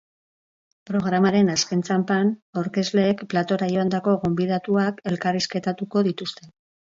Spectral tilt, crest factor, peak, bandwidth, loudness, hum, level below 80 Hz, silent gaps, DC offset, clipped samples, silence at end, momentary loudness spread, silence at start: -5.5 dB/octave; 16 dB; -8 dBFS; 7.6 kHz; -23 LUFS; none; -60 dBFS; 2.42-2.53 s; under 0.1%; under 0.1%; 0.45 s; 7 LU; 0.9 s